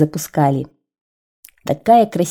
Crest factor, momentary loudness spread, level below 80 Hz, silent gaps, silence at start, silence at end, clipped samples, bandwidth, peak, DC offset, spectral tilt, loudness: 16 dB; 16 LU; -56 dBFS; 1.01-1.43 s; 0 s; 0 s; under 0.1%; 18.5 kHz; -2 dBFS; under 0.1%; -6.5 dB/octave; -16 LUFS